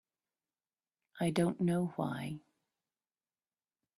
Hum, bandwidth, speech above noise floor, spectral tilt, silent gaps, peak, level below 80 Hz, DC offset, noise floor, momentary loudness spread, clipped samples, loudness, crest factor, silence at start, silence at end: none; 13.5 kHz; over 56 dB; -7 dB/octave; none; -18 dBFS; -74 dBFS; under 0.1%; under -90 dBFS; 11 LU; under 0.1%; -35 LUFS; 20 dB; 1.15 s; 1.6 s